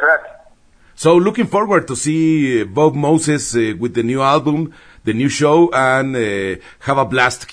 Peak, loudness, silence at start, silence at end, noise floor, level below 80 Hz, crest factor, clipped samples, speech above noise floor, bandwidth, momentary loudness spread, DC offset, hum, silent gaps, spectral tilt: 0 dBFS; -15 LUFS; 0 s; 0 s; -48 dBFS; -50 dBFS; 16 dB; under 0.1%; 33 dB; 10.5 kHz; 8 LU; under 0.1%; none; none; -5 dB/octave